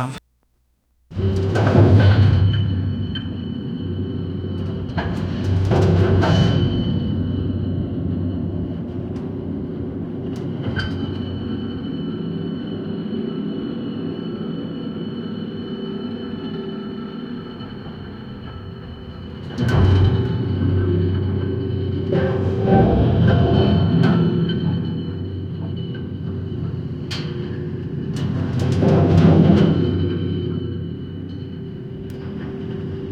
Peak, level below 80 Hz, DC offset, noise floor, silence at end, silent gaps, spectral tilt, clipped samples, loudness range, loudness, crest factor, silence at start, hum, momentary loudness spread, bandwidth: 0 dBFS; -36 dBFS; under 0.1%; -64 dBFS; 0 s; none; -8.5 dB/octave; under 0.1%; 10 LU; -21 LUFS; 20 dB; 0 s; none; 15 LU; 7.2 kHz